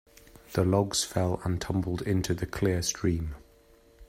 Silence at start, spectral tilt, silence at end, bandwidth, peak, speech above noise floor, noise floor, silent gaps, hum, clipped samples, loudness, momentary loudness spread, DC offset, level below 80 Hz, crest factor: 0.35 s; -5 dB/octave; 0.05 s; 16 kHz; -10 dBFS; 31 dB; -59 dBFS; none; none; under 0.1%; -29 LUFS; 8 LU; under 0.1%; -48 dBFS; 18 dB